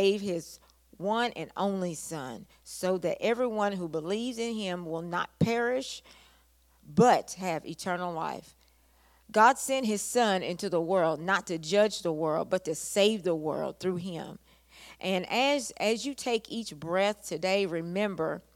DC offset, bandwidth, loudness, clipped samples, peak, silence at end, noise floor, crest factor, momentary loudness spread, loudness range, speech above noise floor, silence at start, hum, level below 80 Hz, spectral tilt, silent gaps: under 0.1%; 17 kHz; -29 LUFS; under 0.1%; -8 dBFS; 0.15 s; -64 dBFS; 22 dB; 11 LU; 4 LU; 34 dB; 0 s; none; -66 dBFS; -4.5 dB/octave; none